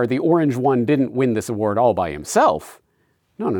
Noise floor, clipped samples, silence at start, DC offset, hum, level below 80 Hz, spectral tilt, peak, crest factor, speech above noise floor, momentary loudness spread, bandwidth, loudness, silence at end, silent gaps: -65 dBFS; under 0.1%; 0 s; under 0.1%; none; -56 dBFS; -6.5 dB/octave; -4 dBFS; 14 dB; 46 dB; 5 LU; 20 kHz; -19 LUFS; 0 s; none